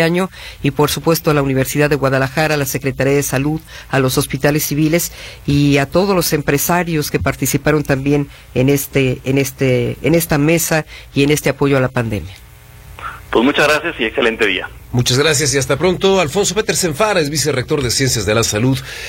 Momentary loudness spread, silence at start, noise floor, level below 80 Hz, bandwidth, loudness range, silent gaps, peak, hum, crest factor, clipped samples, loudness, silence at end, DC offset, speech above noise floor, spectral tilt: 7 LU; 0 s; -38 dBFS; -38 dBFS; 16.5 kHz; 2 LU; none; 0 dBFS; none; 16 dB; under 0.1%; -15 LUFS; 0 s; under 0.1%; 23 dB; -4.5 dB/octave